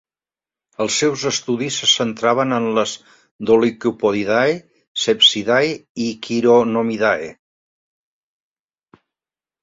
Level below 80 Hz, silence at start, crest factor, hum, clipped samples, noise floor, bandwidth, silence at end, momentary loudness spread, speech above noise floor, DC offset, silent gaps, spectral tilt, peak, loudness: -60 dBFS; 0.8 s; 18 dB; none; under 0.1%; under -90 dBFS; 7.8 kHz; 2.3 s; 12 LU; over 73 dB; under 0.1%; 3.31-3.39 s, 4.88-4.95 s, 5.89-5.95 s; -3 dB/octave; -2 dBFS; -17 LUFS